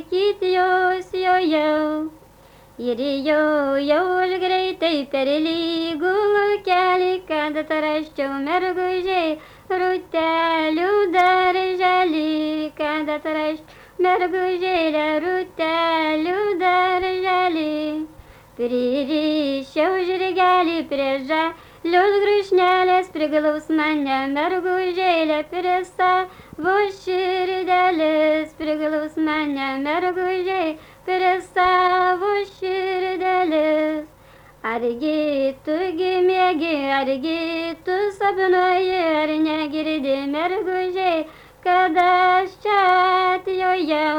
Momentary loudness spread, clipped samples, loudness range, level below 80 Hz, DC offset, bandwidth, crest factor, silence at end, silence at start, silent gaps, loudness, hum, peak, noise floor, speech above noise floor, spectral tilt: 7 LU; under 0.1%; 3 LU; -56 dBFS; under 0.1%; 19 kHz; 14 dB; 0 s; 0 s; none; -20 LUFS; none; -6 dBFS; -48 dBFS; 29 dB; -4.5 dB/octave